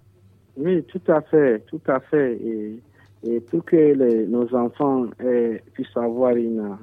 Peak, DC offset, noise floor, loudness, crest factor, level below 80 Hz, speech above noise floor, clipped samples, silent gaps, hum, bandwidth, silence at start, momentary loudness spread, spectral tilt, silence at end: -4 dBFS; under 0.1%; -54 dBFS; -21 LUFS; 16 dB; -68 dBFS; 33 dB; under 0.1%; none; none; 3.9 kHz; 0.55 s; 12 LU; -10 dB/octave; 0.05 s